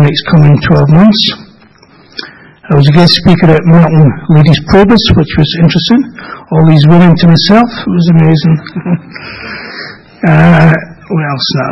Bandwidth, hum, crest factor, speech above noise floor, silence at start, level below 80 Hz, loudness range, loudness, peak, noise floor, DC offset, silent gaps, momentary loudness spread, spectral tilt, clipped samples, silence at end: 6 kHz; none; 6 dB; 34 dB; 0 s; -30 dBFS; 4 LU; -7 LUFS; 0 dBFS; -40 dBFS; under 0.1%; none; 17 LU; -7.5 dB/octave; 3%; 0 s